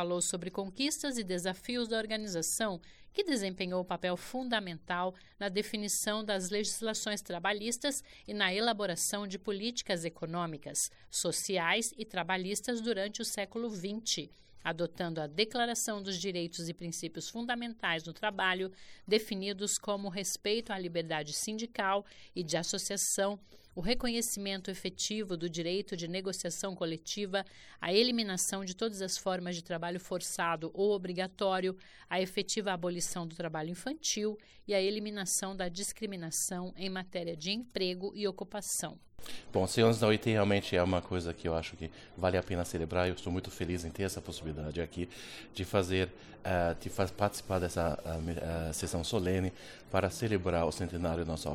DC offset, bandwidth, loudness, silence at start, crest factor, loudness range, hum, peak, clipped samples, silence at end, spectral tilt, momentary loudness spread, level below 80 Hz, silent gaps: under 0.1%; 18 kHz; -34 LUFS; 0 s; 20 dB; 4 LU; none; -14 dBFS; under 0.1%; 0 s; -3.5 dB/octave; 8 LU; -56 dBFS; none